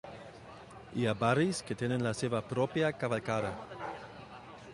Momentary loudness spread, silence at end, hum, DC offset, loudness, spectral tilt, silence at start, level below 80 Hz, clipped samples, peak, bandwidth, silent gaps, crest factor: 20 LU; 0 s; none; under 0.1%; -33 LUFS; -6 dB/octave; 0.05 s; -64 dBFS; under 0.1%; -14 dBFS; 11.5 kHz; none; 20 dB